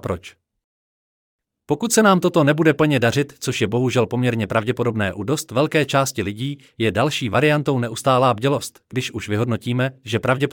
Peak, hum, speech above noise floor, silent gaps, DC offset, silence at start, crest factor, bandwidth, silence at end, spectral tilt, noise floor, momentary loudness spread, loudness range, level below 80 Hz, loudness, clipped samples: -4 dBFS; none; over 71 dB; 0.64-1.39 s; under 0.1%; 0.05 s; 16 dB; 18.5 kHz; 0 s; -5.5 dB/octave; under -90 dBFS; 10 LU; 3 LU; -58 dBFS; -20 LUFS; under 0.1%